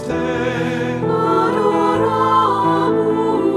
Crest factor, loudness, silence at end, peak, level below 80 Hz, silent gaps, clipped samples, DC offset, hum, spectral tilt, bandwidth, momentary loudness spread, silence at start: 12 dB; -16 LUFS; 0 s; -4 dBFS; -48 dBFS; none; under 0.1%; under 0.1%; none; -7 dB/octave; 12.5 kHz; 6 LU; 0 s